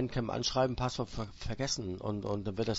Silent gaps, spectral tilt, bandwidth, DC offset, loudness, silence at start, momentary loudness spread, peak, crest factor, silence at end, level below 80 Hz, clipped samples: none; -5 dB/octave; 8 kHz; under 0.1%; -35 LUFS; 0 s; 8 LU; -16 dBFS; 18 dB; 0 s; -48 dBFS; under 0.1%